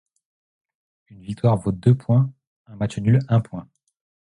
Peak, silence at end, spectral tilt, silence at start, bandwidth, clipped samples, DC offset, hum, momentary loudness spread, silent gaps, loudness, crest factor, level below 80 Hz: -4 dBFS; 0.65 s; -9 dB/octave; 1.3 s; 10.5 kHz; under 0.1%; under 0.1%; none; 17 LU; 2.47-2.65 s; -21 LUFS; 18 dB; -50 dBFS